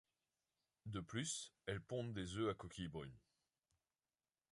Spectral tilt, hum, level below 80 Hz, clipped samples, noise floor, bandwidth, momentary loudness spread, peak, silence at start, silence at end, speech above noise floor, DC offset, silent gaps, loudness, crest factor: -4.5 dB/octave; none; -68 dBFS; under 0.1%; under -90 dBFS; 11.5 kHz; 9 LU; -28 dBFS; 0.85 s; 1.35 s; over 43 dB; under 0.1%; none; -47 LUFS; 22 dB